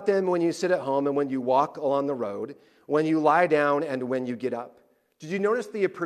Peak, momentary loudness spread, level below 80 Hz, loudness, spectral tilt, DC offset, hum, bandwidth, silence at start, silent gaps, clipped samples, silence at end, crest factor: -8 dBFS; 12 LU; -78 dBFS; -25 LUFS; -6.5 dB/octave; under 0.1%; none; 13 kHz; 0 s; none; under 0.1%; 0 s; 18 dB